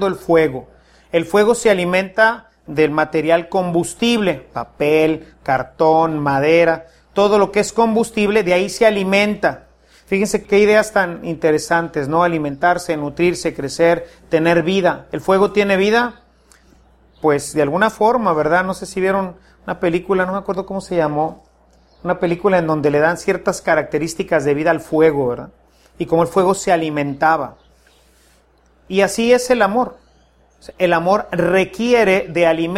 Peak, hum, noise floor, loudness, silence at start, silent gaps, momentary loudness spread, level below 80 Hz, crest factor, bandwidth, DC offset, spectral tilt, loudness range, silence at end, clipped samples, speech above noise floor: 0 dBFS; none; -54 dBFS; -16 LUFS; 0 s; none; 8 LU; -48 dBFS; 16 dB; 15.5 kHz; under 0.1%; -5 dB/octave; 3 LU; 0 s; under 0.1%; 38 dB